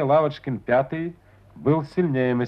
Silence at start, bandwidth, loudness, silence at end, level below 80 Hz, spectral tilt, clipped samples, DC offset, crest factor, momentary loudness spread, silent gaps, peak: 0 s; 6.2 kHz; -24 LUFS; 0 s; -58 dBFS; -9.5 dB/octave; under 0.1%; under 0.1%; 16 dB; 10 LU; none; -8 dBFS